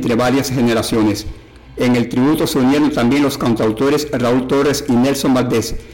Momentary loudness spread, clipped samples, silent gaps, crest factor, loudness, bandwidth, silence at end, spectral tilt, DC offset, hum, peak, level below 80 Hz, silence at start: 4 LU; under 0.1%; none; 6 dB; -15 LUFS; 17 kHz; 0 s; -5.5 dB/octave; 0.3%; none; -8 dBFS; -38 dBFS; 0 s